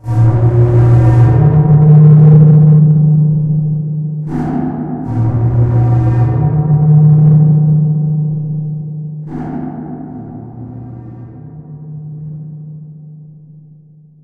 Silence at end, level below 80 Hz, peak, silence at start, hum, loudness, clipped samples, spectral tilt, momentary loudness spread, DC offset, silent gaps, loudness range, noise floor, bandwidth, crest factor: 1 s; -32 dBFS; 0 dBFS; 0.05 s; none; -10 LUFS; under 0.1%; -12 dB/octave; 23 LU; under 0.1%; none; 22 LU; -41 dBFS; 2.4 kHz; 10 dB